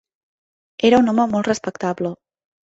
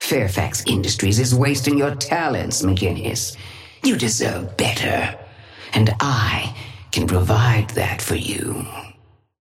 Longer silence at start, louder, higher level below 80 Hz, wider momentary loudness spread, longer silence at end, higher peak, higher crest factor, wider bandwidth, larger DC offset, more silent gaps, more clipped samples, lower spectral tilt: first, 0.8 s vs 0 s; about the same, -19 LUFS vs -20 LUFS; second, -58 dBFS vs -42 dBFS; about the same, 11 LU vs 11 LU; about the same, 0.6 s vs 0.5 s; about the same, -2 dBFS vs -4 dBFS; about the same, 18 dB vs 16 dB; second, 8 kHz vs 16.5 kHz; neither; neither; neither; about the same, -5.5 dB/octave vs -4.5 dB/octave